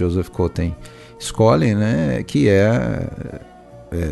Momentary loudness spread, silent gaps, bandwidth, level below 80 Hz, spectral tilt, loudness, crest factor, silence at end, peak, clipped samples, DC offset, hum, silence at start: 17 LU; none; 12.5 kHz; -36 dBFS; -7 dB/octave; -18 LUFS; 16 dB; 0 s; -2 dBFS; under 0.1%; under 0.1%; none; 0 s